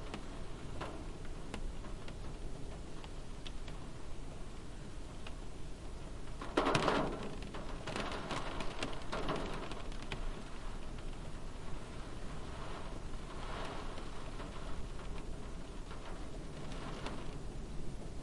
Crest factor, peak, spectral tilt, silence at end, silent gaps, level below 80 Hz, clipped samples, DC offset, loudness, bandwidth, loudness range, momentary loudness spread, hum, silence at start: 24 dB; -16 dBFS; -5 dB/octave; 0 s; none; -46 dBFS; under 0.1%; under 0.1%; -44 LUFS; 11.5 kHz; 11 LU; 10 LU; none; 0 s